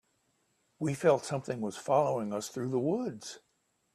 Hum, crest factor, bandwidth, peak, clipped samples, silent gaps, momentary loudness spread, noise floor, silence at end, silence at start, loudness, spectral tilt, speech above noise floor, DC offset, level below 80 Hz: none; 20 dB; 14 kHz; -12 dBFS; under 0.1%; none; 12 LU; -75 dBFS; 0.55 s; 0.8 s; -32 LUFS; -6 dB/octave; 44 dB; under 0.1%; -74 dBFS